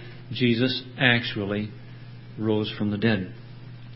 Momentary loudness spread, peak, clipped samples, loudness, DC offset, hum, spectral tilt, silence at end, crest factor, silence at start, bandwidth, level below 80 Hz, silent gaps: 22 LU; -4 dBFS; under 0.1%; -25 LUFS; under 0.1%; none; -10 dB/octave; 0 s; 22 dB; 0 s; 5.8 kHz; -56 dBFS; none